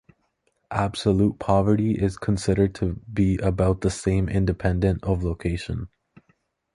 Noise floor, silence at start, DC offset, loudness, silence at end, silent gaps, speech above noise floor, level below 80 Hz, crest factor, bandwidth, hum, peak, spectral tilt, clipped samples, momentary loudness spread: -71 dBFS; 0.7 s; under 0.1%; -24 LUFS; 0.85 s; none; 48 dB; -36 dBFS; 18 dB; 11 kHz; none; -6 dBFS; -7 dB/octave; under 0.1%; 8 LU